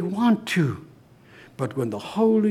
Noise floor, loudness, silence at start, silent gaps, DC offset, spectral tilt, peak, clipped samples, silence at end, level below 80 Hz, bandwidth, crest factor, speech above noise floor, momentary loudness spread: -51 dBFS; -24 LUFS; 0 s; none; under 0.1%; -7 dB/octave; -8 dBFS; under 0.1%; 0 s; -64 dBFS; 14.5 kHz; 14 dB; 29 dB; 10 LU